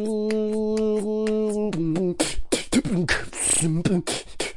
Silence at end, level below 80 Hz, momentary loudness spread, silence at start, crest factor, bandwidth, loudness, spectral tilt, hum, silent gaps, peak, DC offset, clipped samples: 0 s; -40 dBFS; 5 LU; 0 s; 18 dB; 11.5 kHz; -24 LUFS; -4 dB/octave; none; none; -6 dBFS; under 0.1%; under 0.1%